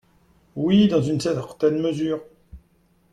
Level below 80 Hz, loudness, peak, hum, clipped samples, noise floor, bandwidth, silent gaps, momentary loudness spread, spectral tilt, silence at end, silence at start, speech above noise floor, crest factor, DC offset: -54 dBFS; -22 LUFS; -8 dBFS; none; under 0.1%; -61 dBFS; 11 kHz; none; 10 LU; -7 dB/octave; 0.55 s; 0.55 s; 41 dB; 16 dB; under 0.1%